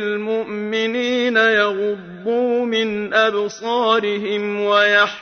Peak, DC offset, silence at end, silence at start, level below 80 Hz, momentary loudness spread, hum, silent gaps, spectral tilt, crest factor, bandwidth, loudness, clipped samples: -4 dBFS; under 0.1%; 0 s; 0 s; -64 dBFS; 9 LU; none; none; -4 dB/octave; 14 dB; 6.6 kHz; -18 LUFS; under 0.1%